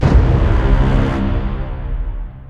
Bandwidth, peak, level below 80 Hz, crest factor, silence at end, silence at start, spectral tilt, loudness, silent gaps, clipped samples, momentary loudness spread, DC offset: 6.8 kHz; 0 dBFS; -16 dBFS; 14 dB; 0 s; 0 s; -8.5 dB/octave; -17 LUFS; none; under 0.1%; 12 LU; under 0.1%